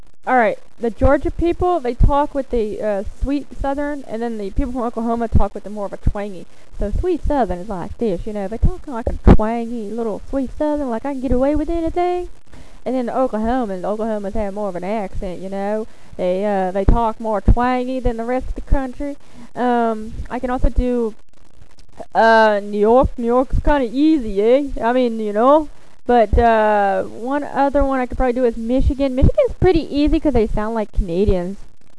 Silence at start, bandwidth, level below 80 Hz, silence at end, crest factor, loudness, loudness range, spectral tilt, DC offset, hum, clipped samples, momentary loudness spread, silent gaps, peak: 0.25 s; 11 kHz; -24 dBFS; 0.35 s; 18 dB; -19 LUFS; 7 LU; -8 dB/octave; 3%; none; under 0.1%; 11 LU; none; 0 dBFS